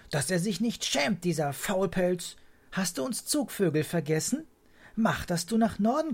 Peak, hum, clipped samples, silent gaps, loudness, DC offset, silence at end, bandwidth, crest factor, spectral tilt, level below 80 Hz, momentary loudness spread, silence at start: -14 dBFS; none; under 0.1%; none; -29 LUFS; under 0.1%; 0 s; 16.5 kHz; 16 dB; -4.5 dB/octave; -56 dBFS; 6 LU; 0.1 s